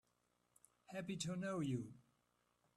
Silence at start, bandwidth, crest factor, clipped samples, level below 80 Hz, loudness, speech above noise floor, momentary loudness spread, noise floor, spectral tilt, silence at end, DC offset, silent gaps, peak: 0.9 s; 13 kHz; 18 dB; under 0.1%; -80 dBFS; -45 LUFS; 38 dB; 10 LU; -83 dBFS; -5.5 dB/octave; 0.75 s; under 0.1%; none; -30 dBFS